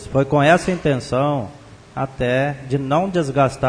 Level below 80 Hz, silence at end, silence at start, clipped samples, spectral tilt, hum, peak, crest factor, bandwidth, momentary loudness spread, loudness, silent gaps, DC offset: -44 dBFS; 0 s; 0 s; under 0.1%; -6.5 dB/octave; none; -2 dBFS; 18 dB; 10.5 kHz; 12 LU; -19 LUFS; none; under 0.1%